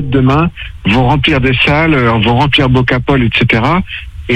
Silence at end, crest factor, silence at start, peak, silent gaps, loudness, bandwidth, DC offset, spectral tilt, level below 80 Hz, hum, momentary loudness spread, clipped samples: 0 s; 10 dB; 0 s; 0 dBFS; none; -10 LUFS; 9 kHz; under 0.1%; -7.5 dB/octave; -26 dBFS; none; 6 LU; under 0.1%